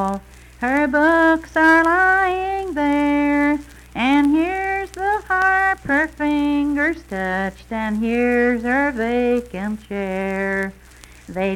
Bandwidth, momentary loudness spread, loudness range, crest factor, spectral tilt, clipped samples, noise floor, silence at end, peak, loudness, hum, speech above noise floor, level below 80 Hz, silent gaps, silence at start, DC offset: 14 kHz; 11 LU; 4 LU; 14 dB; -6 dB/octave; under 0.1%; -43 dBFS; 0 s; -4 dBFS; -19 LUFS; 60 Hz at -60 dBFS; 25 dB; -42 dBFS; none; 0 s; under 0.1%